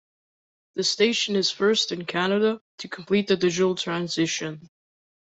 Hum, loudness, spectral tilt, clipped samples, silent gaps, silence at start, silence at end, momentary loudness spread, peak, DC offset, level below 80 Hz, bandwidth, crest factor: none; -23 LUFS; -3.5 dB/octave; under 0.1%; 2.61-2.78 s; 0.75 s; 0.7 s; 14 LU; -6 dBFS; under 0.1%; -68 dBFS; 8.4 kHz; 20 dB